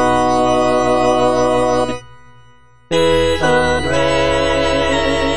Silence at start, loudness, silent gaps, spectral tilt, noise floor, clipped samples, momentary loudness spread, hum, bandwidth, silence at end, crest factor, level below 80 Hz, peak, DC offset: 0 s; -15 LUFS; none; -4.5 dB/octave; -49 dBFS; under 0.1%; 3 LU; none; 10.5 kHz; 0 s; 14 dB; -34 dBFS; -2 dBFS; 4%